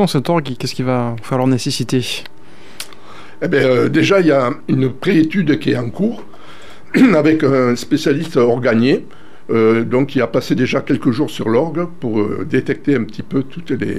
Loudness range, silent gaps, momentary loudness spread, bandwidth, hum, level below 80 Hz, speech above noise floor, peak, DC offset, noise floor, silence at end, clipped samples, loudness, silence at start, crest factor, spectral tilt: 4 LU; none; 9 LU; 14.5 kHz; none; -52 dBFS; 24 dB; -2 dBFS; 3%; -39 dBFS; 0 s; under 0.1%; -16 LUFS; 0 s; 14 dB; -6.5 dB/octave